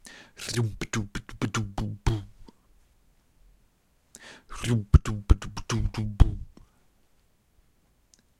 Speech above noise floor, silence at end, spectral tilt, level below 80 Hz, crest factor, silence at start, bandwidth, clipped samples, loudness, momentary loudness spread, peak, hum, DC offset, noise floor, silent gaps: 42 dB; 1.9 s; -5.5 dB/octave; -32 dBFS; 26 dB; 0.05 s; 13.5 kHz; under 0.1%; -28 LUFS; 24 LU; -2 dBFS; none; under 0.1%; -66 dBFS; none